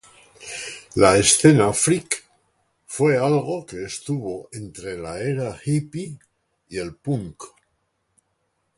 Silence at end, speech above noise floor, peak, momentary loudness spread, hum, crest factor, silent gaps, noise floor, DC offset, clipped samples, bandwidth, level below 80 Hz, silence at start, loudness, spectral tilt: 1.3 s; 51 dB; 0 dBFS; 20 LU; none; 22 dB; none; -72 dBFS; under 0.1%; under 0.1%; 11.5 kHz; -50 dBFS; 0.4 s; -21 LUFS; -4.5 dB/octave